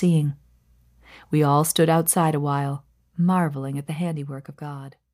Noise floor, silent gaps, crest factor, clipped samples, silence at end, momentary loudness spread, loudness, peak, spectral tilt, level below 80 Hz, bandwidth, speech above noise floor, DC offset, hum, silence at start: -58 dBFS; none; 16 dB; under 0.1%; 0.25 s; 17 LU; -22 LUFS; -6 dBFS; -5.5 dB/octave; -62 dBFS; 15.5 kHz; 36 dB; under 0.1%; 60 Hz at -45 dBFS; 0 s